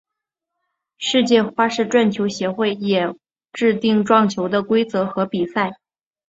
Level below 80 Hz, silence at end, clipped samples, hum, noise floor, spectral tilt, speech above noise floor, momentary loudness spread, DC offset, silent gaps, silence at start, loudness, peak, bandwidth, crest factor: -62 dBFS; 0.55 s; under 0.1%; none; -83 dBFS; -5 dB/octave; 65 dB; 7 LU; under 0.1%; none; 1 s; -19 LUFS; -2 dBFS; 8 kHz; 18 dB